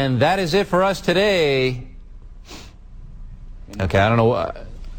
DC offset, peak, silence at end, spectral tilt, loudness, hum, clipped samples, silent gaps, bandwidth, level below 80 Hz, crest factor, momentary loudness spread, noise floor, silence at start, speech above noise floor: under 0.1%; -4 dBFS; 0 s; -6 dB/octave; -18 LUFS; none; under 0.1%; none; 18 kHz; -38 dBFS; 16 dB; 22 LU; -39 dBFS; 0 s; 21 dB